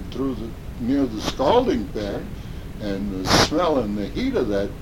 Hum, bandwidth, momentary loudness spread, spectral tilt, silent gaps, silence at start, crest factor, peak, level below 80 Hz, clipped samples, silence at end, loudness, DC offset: none; 17 kHz; 14 LU; -5 dB/octave; none; 0 s; 22 dB; -2 dBFS; -36 dBFS; under 0.1%; 0 s; -22 LUFS; under 0.1%